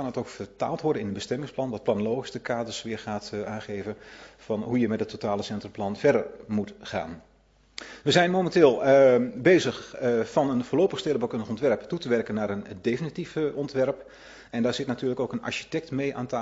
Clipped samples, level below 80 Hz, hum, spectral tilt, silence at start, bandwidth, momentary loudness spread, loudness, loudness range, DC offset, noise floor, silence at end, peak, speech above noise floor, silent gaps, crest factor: under 0.1%; -60 dBFS; none; -5.5 dB/octave; 0 s; 8 kHz; 14 LU; -26 LUFS; 9 LU; under 0.1%; -47 dBFS; 0 s; -6 dBFS; 21 dB; none; 22 dB